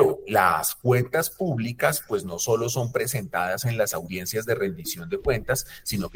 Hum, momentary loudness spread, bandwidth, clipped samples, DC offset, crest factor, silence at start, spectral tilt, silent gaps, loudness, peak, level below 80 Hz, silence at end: none; 8 LU; 19 kHz; under 0.1%; under 0.1%; 20 dB; 0 s; -4.5 dB/octave; none; -25 LUFS; -4 dBFS; -50 dBFS; 0 s